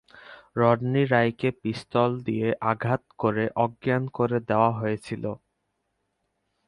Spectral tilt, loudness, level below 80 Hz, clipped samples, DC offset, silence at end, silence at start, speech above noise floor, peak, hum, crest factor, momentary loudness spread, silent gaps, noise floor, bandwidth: -8 dB/octave; -25 LUFS; -62 dBFS; under 0.1%; under 0.1%; 1.3 s; 0.15 s; 52 dB; -6 dBFS; none; 20 dB; 10 LU; none; -77 dBFS; 11 kHz